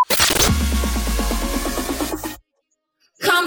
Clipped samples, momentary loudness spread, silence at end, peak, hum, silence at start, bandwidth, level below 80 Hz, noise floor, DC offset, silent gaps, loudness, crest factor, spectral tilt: under 0.1%; 13 LU; 0 s; -2 dBFS; none; 0 s; over 20 kHz; -26 dBFS; -72 dBFS; under 0.1%; none; -19 LUFS; 18 dB; -3 dB/octave